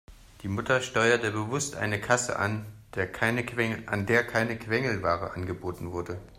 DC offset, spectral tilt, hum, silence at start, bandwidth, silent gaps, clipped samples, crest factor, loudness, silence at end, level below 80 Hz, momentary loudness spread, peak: under 0.1%; -4.5 dB/octave; none; 0.1 s; 16 kHz; none; under 0.1%; 20 dB; -28 LUFS; 0 s; -56 dBFS; 11 LU; -8 dBFS